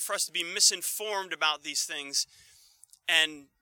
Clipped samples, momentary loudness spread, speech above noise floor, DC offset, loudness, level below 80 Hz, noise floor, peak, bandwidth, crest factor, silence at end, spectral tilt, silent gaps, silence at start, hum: under 0.1%; 10 LU; 29 dB; under 0.1%; -27 LUFS; -82 dBFS; -59 dBFS; -8 dBFS; 19 kHz; 22 dB; 0.2 s; 2 dB/octave; none; 0 s; none